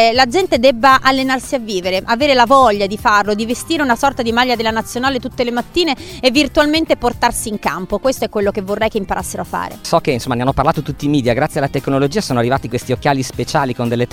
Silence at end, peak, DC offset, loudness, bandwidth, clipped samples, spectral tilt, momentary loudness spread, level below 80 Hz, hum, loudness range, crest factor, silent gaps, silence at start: 0.05 s; 0 dBFS; under 0.1%; -15 LUFS; 17.5 kHz; under 0.1%; -4.5 dB/octave; 8 LU; -38 dBFS; none; 5 LU; 16 dB; none; 0 s